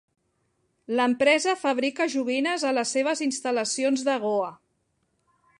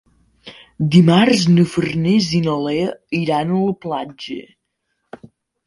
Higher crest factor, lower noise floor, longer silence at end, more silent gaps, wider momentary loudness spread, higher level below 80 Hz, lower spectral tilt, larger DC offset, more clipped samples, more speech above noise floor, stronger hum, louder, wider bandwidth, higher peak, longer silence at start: about the same, 18 dB vs 18 dB; about the same, -73 dBFS vs -72 dBFS; second, 1.05 s vs 1.25 s; neither; second, 6 LU vs 14 LU; second, -76 dBFS vs -52 dBFS; second, -2.5 dB/octave vs -6.5 dB/octave; neither; neither; second, 48 dB vs 56 dB; neither; second, -25 LUFS vs -16 LUFS; about the same, 11.5 kHz vs 11.5 kHz; second, -8 dBFS vs 0 dBFS; first, 0.9 s vs 0.45 s